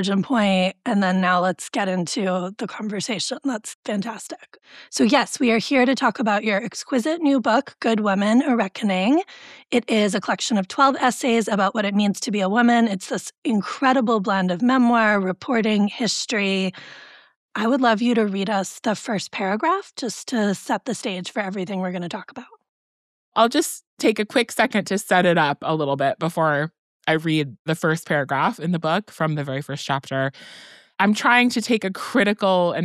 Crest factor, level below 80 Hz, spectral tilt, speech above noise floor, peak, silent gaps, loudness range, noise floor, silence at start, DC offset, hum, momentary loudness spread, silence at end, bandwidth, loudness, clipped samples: 18 dB; -70 dBFS; -4.5 dB/octave; over 69 dB; -2 dBFS; 3.75-3.83 s, 13.38-13.42 s, 17.36-17.49 s, 22.69-23.32 s, 23.87-23.97 s, 26.79-27.00 s, 27.59-27.65 s; 5 LU; under -90 dBFS; 0 s; under 0.1%; none; 10 LU; 0 s; 14 kHz; -21 LUFS; under 0.1%